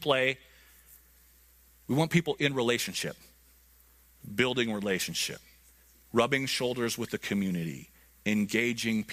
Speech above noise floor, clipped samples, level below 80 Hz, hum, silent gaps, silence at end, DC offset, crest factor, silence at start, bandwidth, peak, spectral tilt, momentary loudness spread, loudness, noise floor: 31 dB; under 0.1%; -64 dBFS; none; none; 0 s; under 0.1%; 22 dB; 0 s; 15.5 kHz; -10 dBFS; -4 dB/octave; 12 LU; -30 LUFS; -60 dBFS